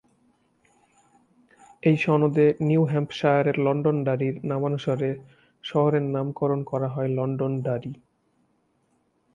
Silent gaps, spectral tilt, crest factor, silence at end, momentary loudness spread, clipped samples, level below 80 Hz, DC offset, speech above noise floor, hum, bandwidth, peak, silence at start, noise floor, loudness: none; -8.5 dB/octave; 18 dB; 1.4 s; 9 LU; under 0.1%; -66 dBFS; under 0.1%; 45 dB; none; 7.4 kHz; -8 dBFS; 1.85 s; -69 dBFS; -24 LUFS